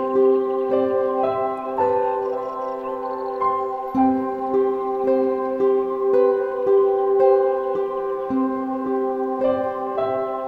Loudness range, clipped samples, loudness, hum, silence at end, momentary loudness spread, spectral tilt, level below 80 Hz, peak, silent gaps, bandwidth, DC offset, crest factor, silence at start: 4 LU; under 0.1%; -21 LUFS; none; 0 s; 7 LU; -8 dB/octave; -60 dBFS; -6 dBFS; none; 4.6 kHz; under 0.1%; 14 dB; 0 s